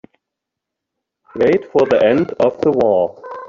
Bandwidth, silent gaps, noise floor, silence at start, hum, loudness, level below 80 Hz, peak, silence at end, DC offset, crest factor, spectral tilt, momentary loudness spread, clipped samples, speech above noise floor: 7.2 kHz; none; -81 dBFS; 1.35 s; none; -15 LUFS; -56 dBFS; -2 dBFS; 0 s; under 0.1%; 14 dB; -7.5 dB/octave; 5 LU; under 0.1%; 67 dB